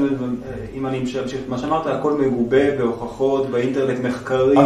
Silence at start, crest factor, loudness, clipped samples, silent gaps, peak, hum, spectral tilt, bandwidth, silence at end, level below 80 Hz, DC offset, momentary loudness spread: 0 s; 18 dB; -21 LUFS; under 0.1%; none; -2 dBFS; none; -7 dB/octave; 10.5 kHz; 0 s; -46 dBFS; under 0.1%; 9 LU